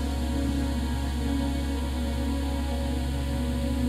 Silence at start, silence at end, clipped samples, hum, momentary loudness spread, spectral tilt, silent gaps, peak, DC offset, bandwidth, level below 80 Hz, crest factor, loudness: 0 s; 0 s; under 0.1%; none; 2 LU; -6.5 dB/octave; none; -16 dBFS; under 0.1%; 14 kHz; -30 dBFS; 12 dB; -29 LUFS